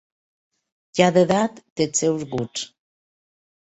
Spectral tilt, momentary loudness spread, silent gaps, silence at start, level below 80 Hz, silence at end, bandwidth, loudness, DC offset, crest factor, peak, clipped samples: -4.5 dB/octave; 13 LU; 1.70-1.76 s; 0.95 s; -60 dBFS; 0.95 s; 8.2 kHz; -21 LUFS; under 0.1%; 22 dB; -2 dBFS; under 0.1%